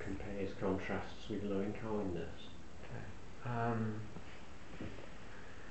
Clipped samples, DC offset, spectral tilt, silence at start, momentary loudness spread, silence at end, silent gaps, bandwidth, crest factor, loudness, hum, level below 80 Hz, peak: under 0.1%; 0.6%; -7 dB/octave; 0 s; 15 LU; 0 s; none; 8.2 kHz; 18 dB; -42 LUFS; none; -58 dBFS; -24 dBFS